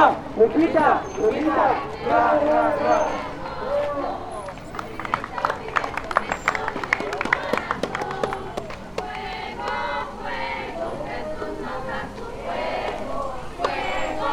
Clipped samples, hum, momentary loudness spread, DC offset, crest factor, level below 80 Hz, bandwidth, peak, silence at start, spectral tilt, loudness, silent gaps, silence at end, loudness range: under 0.1%; none; 13 LU; under 0.1%; 22 dB; -44 dBFS; 18 kHz; 0 dBFS; 0 s; -5 dB/octave; -24 LUFS; none; 0 s; 8 LU